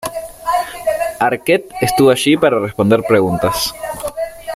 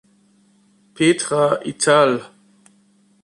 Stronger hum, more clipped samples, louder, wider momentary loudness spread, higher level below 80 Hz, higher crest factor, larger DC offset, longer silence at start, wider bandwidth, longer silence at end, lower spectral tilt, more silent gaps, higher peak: neither; neither; about the same, -15 LUFS vs -17 LUFS; first, 12 LU vs 5 LU; first, -44 dBFS vs -64 dBFS; about the same, 14 dB vs 18 dB; neither; second, 0 s vs 1 s; first, 16 kHz vs 11.5 kHz; second, 0 s vs 1 s; about the same, -4.5 dB/octave vs -4 dB/octave; neither; about the same, -2 dBFS vs -2 dBFS